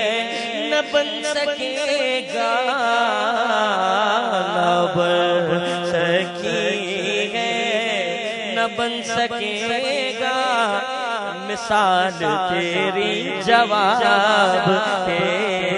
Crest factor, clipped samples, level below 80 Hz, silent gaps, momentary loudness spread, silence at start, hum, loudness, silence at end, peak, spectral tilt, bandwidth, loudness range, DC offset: 18 dB; under 0.1%; -62 dBFS; none; 6 LU; 0 s; none; -19 LUFS; 0 s; -2 dBFS; -3.5 dB/octave; 11 kHz; 4 LU; under 0.1%